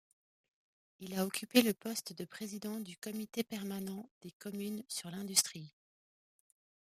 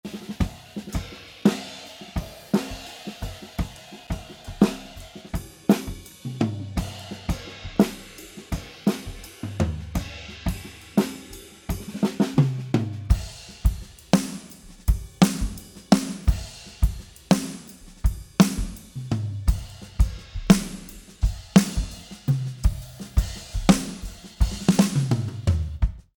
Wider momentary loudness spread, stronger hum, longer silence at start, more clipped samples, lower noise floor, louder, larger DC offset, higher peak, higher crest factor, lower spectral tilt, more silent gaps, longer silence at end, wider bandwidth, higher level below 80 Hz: about the same, 18 LU vs 17 LU; neither; first, 1 s vs 0.05 s; neither; first, under -90 dBFS vs -44 dBFS; second, -37 LUFS vs -26 LUFS; neither; second, -12 dBFS vs 0 dBFS; about the same, 28 dB vs 24 dB; second, -3 dB/octave vs -6 dB/octave; first, 4.11-4.21 s, 4.33-4.40 s vs none; first, 1.2 s vs 0.15 s; second, 15.5 kHz vs 18.5 kHz; second, -82 dBFS vs -32 dBFS